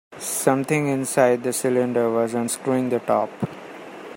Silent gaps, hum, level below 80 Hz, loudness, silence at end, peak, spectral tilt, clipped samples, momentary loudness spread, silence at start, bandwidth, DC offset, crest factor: none; none; -66 dBFS; -22 LUFS; 0 s; -2 dBFS; -5 dB/octave; under 0.1%; 12 LU; 0.1 s; 16.5 kHz; under 0.1%; 20 dB